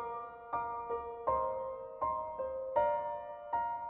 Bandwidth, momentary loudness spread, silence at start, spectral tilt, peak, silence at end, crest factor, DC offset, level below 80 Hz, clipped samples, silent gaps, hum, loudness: 4 kHz; 9 LU; 0 s; -4.5 dB/octave; -18 dBFS; 0 s; 18 dB; under 0.1%; -62 dBFS; under 0.1%; none; none; -37 LUFS